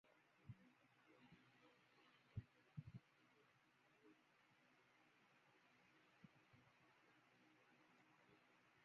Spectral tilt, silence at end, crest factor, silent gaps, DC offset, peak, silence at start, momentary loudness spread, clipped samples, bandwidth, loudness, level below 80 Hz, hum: -6 dB/octave; 0 s; 26 dB; none; under 0.1%; -42 dBFS; 0.05 s; 7 LU; under 0.1%; 6.6 kHz; -63 LUFS; -82 dBFS; none